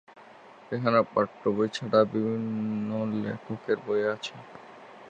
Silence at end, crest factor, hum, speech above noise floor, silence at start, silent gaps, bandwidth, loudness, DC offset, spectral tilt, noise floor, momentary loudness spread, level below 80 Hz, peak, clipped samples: 0 s; 20 dB; none; 23 dB; 0.15 s; none; 8.6 kHz; -28 LUFS; under 0.1%; -7 dB/octave; -51 dBFS; 14 LU; -70 dBFS; -8 dBFS; under 0.1%